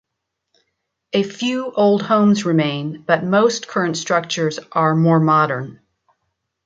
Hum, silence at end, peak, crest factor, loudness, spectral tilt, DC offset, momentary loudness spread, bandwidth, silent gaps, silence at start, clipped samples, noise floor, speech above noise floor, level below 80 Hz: none; 0.9 s; -2 dBFS; 16 dB; -18 LUFS; -5.5 dB/octave; under 0.1%; 7 LU; 7.8 kHz; none; 1.15 s; under 0.1%; -78 dBFS; 61 dB; -64 dBFS